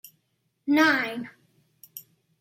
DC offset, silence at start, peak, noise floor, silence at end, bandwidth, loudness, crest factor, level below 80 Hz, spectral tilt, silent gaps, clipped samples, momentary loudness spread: under 0.1%; 0.65 s; -8 dBFS; -74 dBFS; 0.4 s; 16.5 kHz; -23 LUFS; 20 dB; -78 dBFS; -3.5 dB/octave; none; under 0.1%; 24 LU